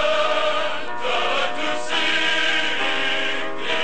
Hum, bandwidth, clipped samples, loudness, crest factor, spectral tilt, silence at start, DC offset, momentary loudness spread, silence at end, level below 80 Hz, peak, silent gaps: none; 9 kHz; under 0.1%; -21 LUFS; 14 dB; -1.5 dB/octave; 0 s; 6%; 6 LU; 0 s; -58 dBFS; -8 dBFS; none